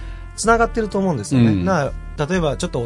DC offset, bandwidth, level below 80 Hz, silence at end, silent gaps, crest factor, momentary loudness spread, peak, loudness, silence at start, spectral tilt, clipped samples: under 0.1%; 11.5 kHz; -32 dBFS; 0 s; none; 18 dB; 9 LU; -2 dBFS; -19 LUFS; 0 s; -6 dB/octave; under 0.1%